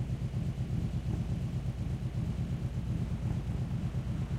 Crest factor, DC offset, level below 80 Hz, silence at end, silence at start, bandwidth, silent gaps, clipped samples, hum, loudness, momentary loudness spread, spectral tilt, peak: 12 dB; under 0.1%; -42 dBFS; 0 s; 0 s; 11 kHz; none; under 0.1%; none; -35 LUFS; 1 LU; -8 dB/octave; -22 dBFS